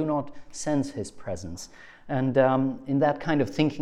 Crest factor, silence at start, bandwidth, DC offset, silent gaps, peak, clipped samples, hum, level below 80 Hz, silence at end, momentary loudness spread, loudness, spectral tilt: 18 dB; 0 s; 12 kHz; under 0.1%; none; -8 dBFS; under 0.1%; none; -56 dBFS; 0 s; 16 LU; -27 LUFS; -6.5 dB/octave